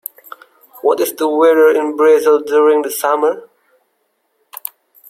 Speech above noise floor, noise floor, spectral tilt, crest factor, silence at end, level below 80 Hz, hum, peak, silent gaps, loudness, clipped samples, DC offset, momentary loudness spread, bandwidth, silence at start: 53 dB; -65 dBFS; -2.5 dB/octave; 14 dB; 1.65 s; -70 dBFS; none; -2 dBFS; none; -13 LUFS; under 0.1%; under 0.1%; 18 LU; 16.5 kHz; 0.85 s